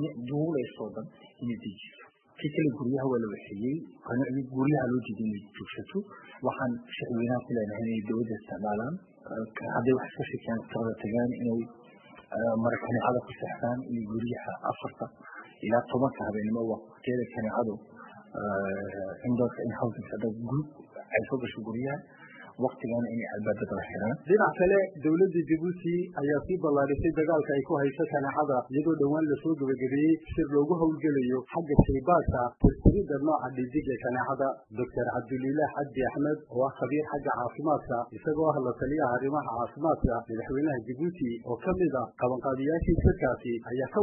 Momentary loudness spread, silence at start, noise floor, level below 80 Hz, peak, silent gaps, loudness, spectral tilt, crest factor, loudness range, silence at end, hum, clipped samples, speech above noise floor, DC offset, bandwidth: 11 LU; 0 s; -53 dBFS; -46 dBFS; -6 dBFS; none; -30 LUFS; -11.5 dB/octave; 24 dB; 6 LU; 0 s; none; under 0.1%; 24 dB; under 0.1%; 3.3 kHz